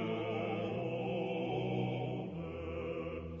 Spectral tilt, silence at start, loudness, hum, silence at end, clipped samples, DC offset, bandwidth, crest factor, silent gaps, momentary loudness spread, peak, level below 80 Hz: -6 dB/octave; 0 s; -38 LUFS; none; 0 s; under 0.1%; under 0.1%; 7.2 kHz; 14 dB; none; 6 LU; -24 dBFS; -58 dBFS